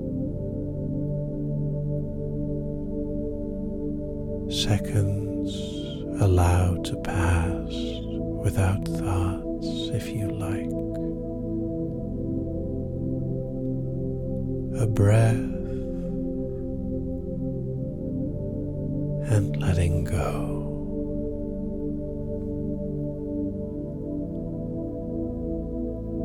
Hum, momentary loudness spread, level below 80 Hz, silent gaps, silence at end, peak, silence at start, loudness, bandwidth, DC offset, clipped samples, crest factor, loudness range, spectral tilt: none; 8 LU; -36 dBFS; none; 0 s; -8 dBFS; 0 s; -28 LUFS; 15 kHz; under 0.1%; under 0.1%; 18 dB; 6 LU; -7 dB/octave